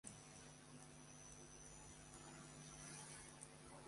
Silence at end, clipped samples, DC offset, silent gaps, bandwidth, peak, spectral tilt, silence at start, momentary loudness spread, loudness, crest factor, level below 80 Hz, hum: 0 s; under 0.1%; under 0.1%; none; 11.5 kHz; -38 dBFS; -3 dB/octave; 0.05 s; 5 LU; -58 LUFS; 22 dB; -72 dBFS; none